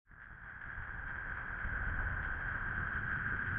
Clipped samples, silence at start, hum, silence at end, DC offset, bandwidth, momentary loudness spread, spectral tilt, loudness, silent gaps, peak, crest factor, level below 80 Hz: under 0.1%; 0.1 s; none; 0 s; under 0.1%; 3.8 kHz; 11 LU; -4.5 dB/octave; -39 LUFS; none; -24 dBFS; 14 dB; -46 dBFS